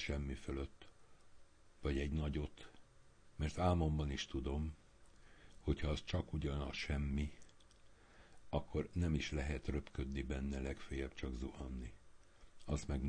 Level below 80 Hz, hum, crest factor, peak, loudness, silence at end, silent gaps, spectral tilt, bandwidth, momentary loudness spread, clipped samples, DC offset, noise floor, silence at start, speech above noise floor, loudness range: -48 dBFS; none; 18 dB; -24 dBFS; -42 LUFS; 0 s; none; -6.5 dB/octave; 9.8 kHz; 10 LU; under 0.1%; under 0.1%; -64 dBFS; 0 s; 23 dB; 4 LU